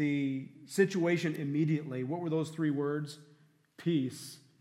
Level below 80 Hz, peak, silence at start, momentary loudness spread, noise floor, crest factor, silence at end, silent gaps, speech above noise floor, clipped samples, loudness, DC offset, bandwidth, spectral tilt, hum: -84 dBFS; -14 dBFS; 0 s; 11 LU; -60 dBFS; 20 dB; 0.2 s; none; 28 dB; under 0.1%; -33 LUFS; under 0.1%; 15.5 kHz; -6.5 dB/octave; none